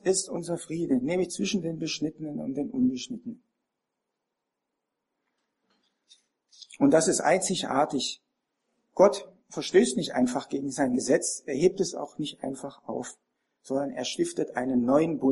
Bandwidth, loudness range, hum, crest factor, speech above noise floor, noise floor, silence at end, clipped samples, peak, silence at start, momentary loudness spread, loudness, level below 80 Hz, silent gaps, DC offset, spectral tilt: 11.5 kHz; 9 LU; none; 22 dB; 58 dB; -84 dBFS; 0 s; under 0.1%; -6 dBFS; 0.05 s; 14 LU; -27 LUFS; -68 dBFS; none; under 0.1%; -4 dB/octave